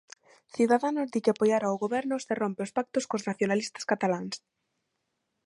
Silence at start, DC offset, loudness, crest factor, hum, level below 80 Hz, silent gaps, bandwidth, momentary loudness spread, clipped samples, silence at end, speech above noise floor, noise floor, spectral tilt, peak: 0.55 s; under 0.1%; -29 LUFS; 18 dB; none; -76 dBFS; none; 11.5 kHz; 8 LU; under 0.1%; 1.1 s; 52 dB; -80 dBFS; -5 dB/octave; -10 dBFS